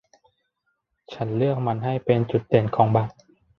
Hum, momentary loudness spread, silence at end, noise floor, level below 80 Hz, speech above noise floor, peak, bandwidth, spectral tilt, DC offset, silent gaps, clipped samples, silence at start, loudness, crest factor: none; 11 LU; 0.5 s; -75 dBFS; -58 dBFS; 53 dB; -4 dBFS; 6.2 kHz; -9.5 dB/octave; under 0.1%; none; under 0.1%; 1.1 s; -23 LUFS; 20 dB